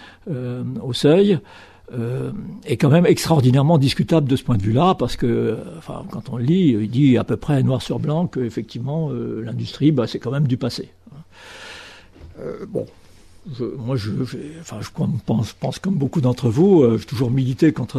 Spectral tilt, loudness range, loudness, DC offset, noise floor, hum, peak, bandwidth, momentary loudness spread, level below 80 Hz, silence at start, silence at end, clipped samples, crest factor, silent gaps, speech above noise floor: -7.5 dB/octave; 12 LU; -19 LUFS; under 0.1%; -42 dBFS; none; -2 dBFS; 13.5 kHz; 17 LU; -46 dBFS; 0 s; 0 s; under 0.1%; 18 dB; none; 23 dB